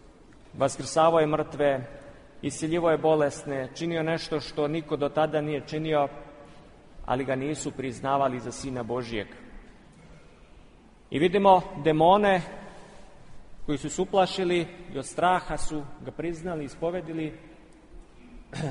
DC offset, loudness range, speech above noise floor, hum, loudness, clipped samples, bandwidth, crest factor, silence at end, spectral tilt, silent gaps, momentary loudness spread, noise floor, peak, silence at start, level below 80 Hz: under 0.1%; 7 LU; 27 dB; none; -27 LUFS; under 0.1%; 10.5 kHz; 22 dB; 0 s; -5.5 dB/octave; none; 15 LU; -53 dBFS; -6 dBFS; 0.55 s; -50 dBFS